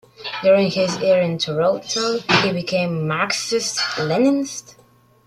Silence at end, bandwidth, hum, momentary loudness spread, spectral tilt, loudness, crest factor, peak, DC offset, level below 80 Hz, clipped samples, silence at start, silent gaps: 0.65 s; 14 kHz; none; 5 LU; -4 dB/octave; -19 LUFS; 18 dB; -2 dBFS; under 0.1%; -60 dBFS; under 0.1%; 0.2 s; none